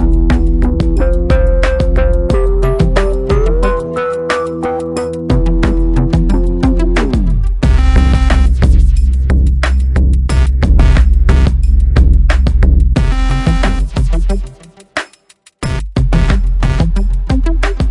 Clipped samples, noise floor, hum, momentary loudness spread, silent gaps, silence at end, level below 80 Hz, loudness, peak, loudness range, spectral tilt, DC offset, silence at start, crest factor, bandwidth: under 0.1%; -47 dBFS; none; 7 LU; none; 0 s; -10 dBFS; -13 LUFS; 0 dBFS; 5 LU; -7.5 dB/octave; under 0.1%; 0 s; 10 dB; 10.5 kHz